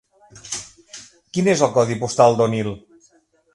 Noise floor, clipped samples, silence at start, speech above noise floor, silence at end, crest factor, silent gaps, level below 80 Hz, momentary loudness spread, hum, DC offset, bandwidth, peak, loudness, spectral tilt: -58 dBFS; under 0.1%; 0.35 s; 41 dB; 0.75 s; 20 dB; none; -56 dBFS; 23 LU; none; under 0.1%; 11.5 kHz; 0 dBFS; -19 LUFS; -5 dB/octave